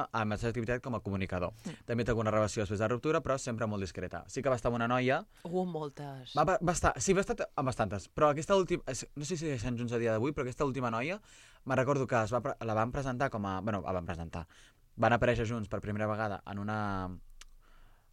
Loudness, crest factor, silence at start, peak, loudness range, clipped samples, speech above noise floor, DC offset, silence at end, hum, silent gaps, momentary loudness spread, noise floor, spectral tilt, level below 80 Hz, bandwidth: -33 LUFS; 20 dB; 0 s; -12 dBFS; 3 LU; under 0.1%; 25 dB; under 0.1%; 0.25 s; none; none; 10 LU; -58 dBFS; -5.5 dB/octave; -52 dBFS; 14 kHz